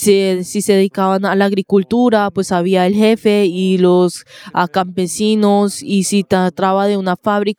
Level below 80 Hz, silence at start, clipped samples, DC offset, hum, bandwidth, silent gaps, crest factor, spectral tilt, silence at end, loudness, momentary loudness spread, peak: -56 dBFS; 0 s; under 0.1%; under 0.1%; none; 16 kHz; none; 14 dB; -5.5 dB/octave; 0.05 s; -14 LUFS; 5 LU; 0 dBFS